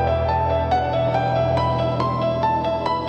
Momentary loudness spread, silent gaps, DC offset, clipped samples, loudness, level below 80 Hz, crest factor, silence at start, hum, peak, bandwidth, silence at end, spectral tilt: 1 LU; none; under 0.1%; under 0.1%; -21 LUFS; -40 dBFS; 12 dB; 0 s; none; -8 dBFS; 8.4 kHz; 0 s; -8 dB/octave